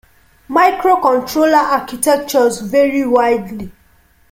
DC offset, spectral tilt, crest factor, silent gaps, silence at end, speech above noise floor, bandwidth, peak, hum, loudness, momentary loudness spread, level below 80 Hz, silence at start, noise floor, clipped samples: under 0.1%; -4 dB/octave; 14 dB; none; 0.6 s; 38 dB; 16.5 kHz; 0 dBFS; none; -14 LUFS; 7 LU; -50 dBFS; 0.5 s; -51 dBFS; under 0.1%